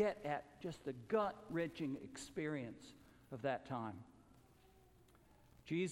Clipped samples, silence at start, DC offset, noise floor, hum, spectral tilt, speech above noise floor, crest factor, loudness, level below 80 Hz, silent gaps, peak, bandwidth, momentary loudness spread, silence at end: under 0.1%; 0 s; under 0.1%; -68 dBFS; none; -6 dB/octave; 25 dB; 20 dB; -44 LUFS; -72 dBFS; none; -26 dBFS; 17 kHz; 19 LU; 0 s